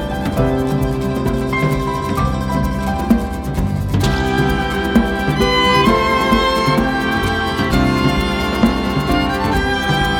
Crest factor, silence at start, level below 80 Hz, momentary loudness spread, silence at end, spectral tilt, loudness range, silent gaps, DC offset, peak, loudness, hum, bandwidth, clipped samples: 14 dB; 0 s; -26 dBFS; 5 LU; 0 s; -6 dB/octave; 4 LU; none; under 0.1%; -2 dBFS; -16 LUFS; none; 18.5 kHz; under 0.1%